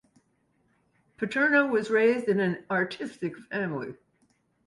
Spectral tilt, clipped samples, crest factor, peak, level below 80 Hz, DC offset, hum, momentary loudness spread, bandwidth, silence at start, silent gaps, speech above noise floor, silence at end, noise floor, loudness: -6.5 dB/octave; under 0.1%; 18 dB; -10 dBFS; -72 dBFS; under 0.1%; none; 13 LU; 11.5 kHz; 1.2 s; none; 44 dB; 0.7 s; -70 dBFS; -27 LUFS